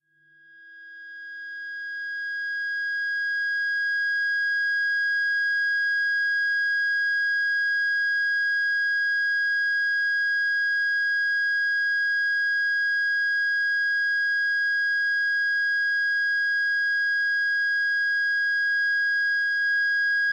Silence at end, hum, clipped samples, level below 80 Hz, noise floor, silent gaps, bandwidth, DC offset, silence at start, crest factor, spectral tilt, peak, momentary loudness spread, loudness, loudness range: 0 s; none; under 0.1%; -78 dBFS; -57 dBFS; none; 8.6 kHz; under 0.1%; 0.6 s; 6 dB; 3.5 dB/octave; -18 dBFS; 4 LU; -22 LUFS; 3 LU